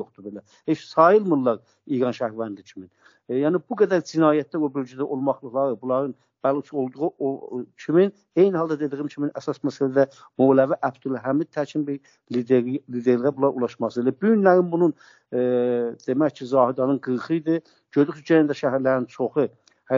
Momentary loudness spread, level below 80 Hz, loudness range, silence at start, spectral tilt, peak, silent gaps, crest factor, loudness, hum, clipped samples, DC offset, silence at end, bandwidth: 10 LU; -74 dBFS; 3 LU; 0 s; -6.5 dB/octave; -2 dBFS; none; 20 dB; -23 LUFS; none; under 0.1%; under 0.1%; 0 s; 7.4 kHz